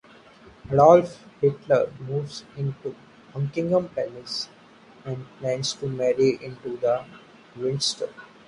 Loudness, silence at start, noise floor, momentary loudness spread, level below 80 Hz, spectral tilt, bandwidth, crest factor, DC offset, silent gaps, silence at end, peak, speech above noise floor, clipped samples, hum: -24 LUFS; 0.65 s; -51 dBFS; 17 LU; -60 dBFS; -5.5 dB/octave; 11 kHz; 22 dB; under 0.1%; none; 0.2 s; -2 dBFS; 27 dB; under 0.1%; none